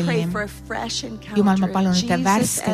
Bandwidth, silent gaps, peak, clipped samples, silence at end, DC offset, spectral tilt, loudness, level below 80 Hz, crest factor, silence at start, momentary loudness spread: 15.5 kHz; none; -6 dBFS; under 0.1%; 0 s; under 0.1%; -4.5 dB/octave; -21 LUFS; -46 dBFS; 16 dB; 0 s; 9 LU